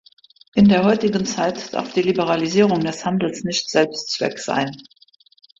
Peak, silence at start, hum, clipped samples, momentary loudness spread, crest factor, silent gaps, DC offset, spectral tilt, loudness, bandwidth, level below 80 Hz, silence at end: -4 dBFS; 0.55 s; none; under 0.1%; 8 LU; 16 dB; none; under 0.1%; -5 dB/octave; -19 LUFS; 7.8 kHz; -54 dBFS; 0.8 s